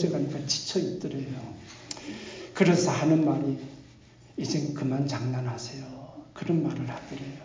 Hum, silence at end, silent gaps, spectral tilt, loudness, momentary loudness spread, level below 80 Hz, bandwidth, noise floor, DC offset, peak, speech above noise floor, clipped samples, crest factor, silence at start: none; 0 s; none; -5.5 dB/octave; -29 LUFS; 18 LU; -62 dBFS; 7.6 kHz; -53 dBFS; under 0.1%; -8 dBFS; 26 dB; under 0.1%; 20 dB; 0 s